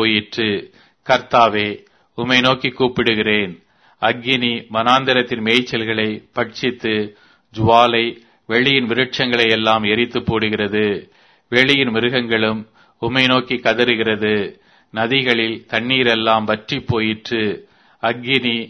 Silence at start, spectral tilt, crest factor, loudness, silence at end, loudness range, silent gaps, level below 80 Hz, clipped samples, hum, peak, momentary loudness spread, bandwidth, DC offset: 0 s; -5.5 dB/octave; 18 dB; -17 LUFS; 0 s; 2 LU; none; -52 dBFS; under 0.1%; none; 0 dBFS; 10 LU; 11 kHz; under 0.1%